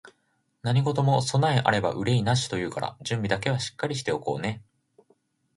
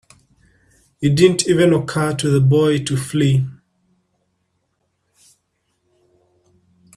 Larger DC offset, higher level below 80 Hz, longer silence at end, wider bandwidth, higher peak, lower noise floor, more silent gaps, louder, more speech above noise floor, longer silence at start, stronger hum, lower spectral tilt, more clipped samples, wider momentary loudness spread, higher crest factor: neither; about the same, -56 dBFS vs -54 dBFS; second, 0.95 s vs 3.45 s; second, 11.5 kHz vs 13.5 kHz; second, -6 dBFS vs 0 dBFS; about the same, -72 dBFS vs -69 dBFS; neither; second, -26 LUFS vs -16 LUFS; second, 47 dB vs 54 dB; second, 0.05 s vs 1 s; neither; about the same, -5.5 dB/octave vs -6 dB/octave; neither; about the same, 9 LU vs 7 LU; about the same, 22 dB vs 20 dB